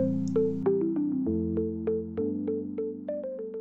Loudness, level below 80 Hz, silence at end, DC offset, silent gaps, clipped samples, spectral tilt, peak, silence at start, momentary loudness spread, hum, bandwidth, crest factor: -30 LUFS; -62 dBFS; 0 s; under 0.1%; none; under 0.1%; -10 dB/octave; -16 dBFS; 0 s; 8 LU; none; 7.4 kHz; 14 dB